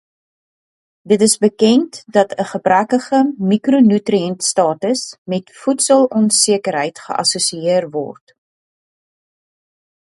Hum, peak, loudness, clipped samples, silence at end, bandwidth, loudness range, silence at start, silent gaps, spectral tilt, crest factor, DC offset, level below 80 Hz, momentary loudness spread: none; 0 dBFS; -15 LUFS; under 0.1%; 2.05 s; 11.5 kHz; 4 LU; 1.05 s; 5.18-5.25 s; -4 dB/octave; 16 dB; under 0.1%; -64 dBFS; 9 LU